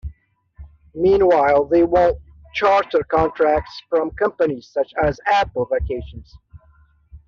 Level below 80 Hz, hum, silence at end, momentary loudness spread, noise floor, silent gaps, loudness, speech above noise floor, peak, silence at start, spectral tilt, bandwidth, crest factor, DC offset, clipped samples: -38 dBFS; none; 0.1 s; 14 LU; -54 dBFS; none; -18 LUFS; 36 dB; -4 dBFS; 0.05 s; -4.5 dB/octave; 7.2 kHz; 16 dB; under 0.1%; under 0.1%